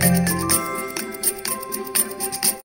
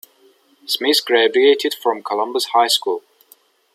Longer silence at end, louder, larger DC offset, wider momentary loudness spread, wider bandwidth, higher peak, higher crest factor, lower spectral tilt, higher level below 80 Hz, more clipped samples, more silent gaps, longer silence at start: second, 0.05 s vs 0.75 s; second, -21 LUFS vs -17 LUFS; neither; about the same, 8 LU vs 10 LU; about the same, 16.5 kHz vs 15.5 kHz; about the same, -2 dBFS vs -2 dBFS; about the same, 20 dB vs 16 dB; first, -3.5 dB/octave vs -0.5 dB/octave; first, -50 dBFS vs -74 dBFS; neither; neither; second, 0 s vs 0.7 s